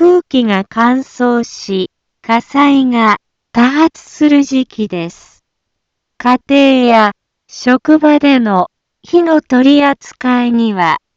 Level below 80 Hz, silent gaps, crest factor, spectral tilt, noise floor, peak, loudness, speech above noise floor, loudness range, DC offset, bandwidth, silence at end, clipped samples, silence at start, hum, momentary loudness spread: -54 dBFS; none; 12 dB; -5.5 dB/octave; -72 dBFS; 0 dBFS; -11 LUFS; 61 dB; 3 LU; under 0.1%; 7.6 kHz; 0.2 s; under 0.1%; 0 s; none; 10 LU